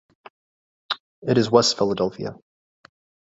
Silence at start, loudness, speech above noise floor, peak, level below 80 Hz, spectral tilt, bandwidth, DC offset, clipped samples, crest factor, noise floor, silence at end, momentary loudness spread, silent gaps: 0.9 s; -21 LUFS; over 70 dB; -2 dBFS; -60 dBFS; -4.5 dB/octave; 8 kHz; under 0.1%; under 0.1%; 22 dB; under -90 dBFS; 0.9 s; 14 LU; 1.00-1.22 s